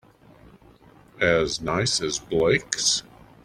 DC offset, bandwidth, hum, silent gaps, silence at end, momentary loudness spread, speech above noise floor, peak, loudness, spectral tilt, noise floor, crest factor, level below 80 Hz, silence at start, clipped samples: under 0.1%; 15 kHz; none; none; 0.45 s; 4 LU; 29 dB; -2 dBFS; -23 LUFS; -3 dB/octave; -52 dBFS; 24 dB; -50 dBFS; 1.2 s; under 0.1%